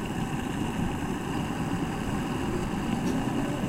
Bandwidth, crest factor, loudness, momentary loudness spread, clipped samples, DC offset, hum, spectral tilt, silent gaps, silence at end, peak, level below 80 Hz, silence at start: 16 kHz; 16 dB; -30 LUFS; 3 LU; under 0.1%; under 0.1%; none; -6 dB/octave; none; 0 s; -14 dBFS; -42 dBFS; 0 s